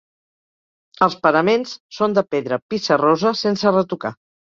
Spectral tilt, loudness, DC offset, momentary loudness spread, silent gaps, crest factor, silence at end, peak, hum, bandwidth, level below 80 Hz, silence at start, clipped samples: -5.5 dB/octave; -18 LUFS; under 0.1%; 9 LU; 1.80-1.89 s, 2.62-2.69 s; 18 dB; 0.4 s; -2 dBFS; none; 7.4 kHz; -64 dBFS; 1 s; under 0.1%